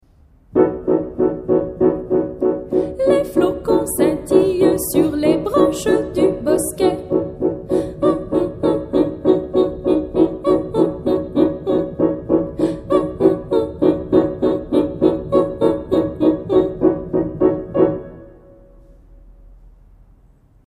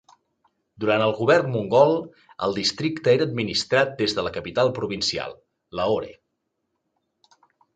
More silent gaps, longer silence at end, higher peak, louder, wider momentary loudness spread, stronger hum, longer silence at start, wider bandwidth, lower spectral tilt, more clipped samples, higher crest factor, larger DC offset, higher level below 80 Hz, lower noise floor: neither; second, 1.1 s vs 1.65 s; about the same, -2 dBFS vs -4 dBFS; first, -18 LUFS vs -22 LUFS; second, 5 LU vs 10 LU; neither; second, 0.55 s vs 0.8 s; first, 15.5 kHz vs 9.2 kHz; first, -6.5 dB/octave vs -4.5 dB/octave; neither; about the same, 16 dB vs 20 dB; neither; first, -42 dBFS vs -56 dBFS; second, -51 dBFS vs -77 dBFS